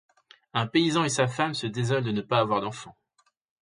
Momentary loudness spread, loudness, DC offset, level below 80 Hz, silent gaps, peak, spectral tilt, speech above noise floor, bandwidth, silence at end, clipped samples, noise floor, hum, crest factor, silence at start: 8 LU; -26 LUFS; under 0.1%; -64 dBFS; none; -8 dBFS; -5 dB/octave; 44 dB; 10.5 kHz; 0.7 s; under 0.1%; -70 dBFS; none; 20 dB; 0.55 s